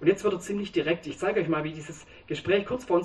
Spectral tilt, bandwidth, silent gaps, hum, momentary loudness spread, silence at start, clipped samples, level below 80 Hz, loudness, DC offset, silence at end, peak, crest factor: -5.5 dB/octave; 12 kHz; none; none; 12 LU; 0 s; under 0.1%; -58 dBFS; -28 LUFS; under 0.1%; 0 s; -8 dBFS; 20 dB